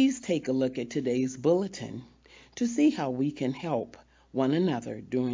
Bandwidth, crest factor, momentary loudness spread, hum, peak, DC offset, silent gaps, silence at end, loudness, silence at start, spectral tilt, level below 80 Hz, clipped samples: 7.6 kHz; 16 dB; 12 LU; none; -12 dBFS; under 0.1%; none; 0 s; -29 LUFS; 0 s; -6 dB/octave; -64 dBFS; under 0.1%